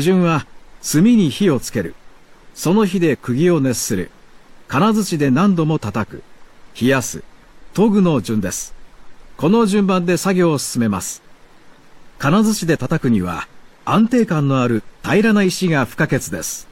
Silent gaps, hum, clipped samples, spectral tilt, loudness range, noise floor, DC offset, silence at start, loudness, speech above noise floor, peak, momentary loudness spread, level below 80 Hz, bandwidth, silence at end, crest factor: none; none; under 0.1%; -5.5 dB/octave; 3 LU; -44 dBFS; under 0.1%; 0 s; -17 LUFS; 28 dB; -4 dBFS; 11 LU; -46 dBFS; 16.5 kHz; 0.1 s; 14 dB